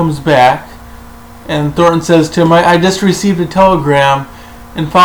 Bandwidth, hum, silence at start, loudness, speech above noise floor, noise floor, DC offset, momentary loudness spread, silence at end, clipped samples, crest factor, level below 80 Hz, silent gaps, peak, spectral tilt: over 20 kHz; none; 0 s; -10 LUFS; 23 dB; -32 dBFS; under 0.1%; 11 LU; 0 s; 0.2%; 10 dB; -36 dBFS; none; 0 dBFS; -5.5 dB/octave